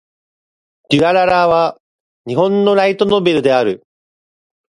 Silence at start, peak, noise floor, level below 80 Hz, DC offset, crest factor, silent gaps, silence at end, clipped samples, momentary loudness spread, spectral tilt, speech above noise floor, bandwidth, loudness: 0.9 s; 0 dBFS; under -90 dBFS; -52 dBFS; under 0.1%; 14 dB; 1.80-2.24 s; 0.95 s; under 0.1%; 8 LU; -6 dB/octave; over 77 dB; 11 kHz; -14 LUFS